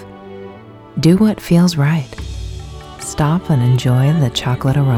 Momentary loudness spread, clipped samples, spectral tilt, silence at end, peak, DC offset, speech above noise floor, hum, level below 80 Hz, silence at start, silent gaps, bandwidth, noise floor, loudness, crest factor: 21 LU; under 0.1%; -6.5 dB/octave; 0 s; 0 dBFS; under 0.1%; 23 dB; none; -36 dBFS; 0 s; none; 15.5 kHz; -36 dBFS; -15 LUFS; 14 dB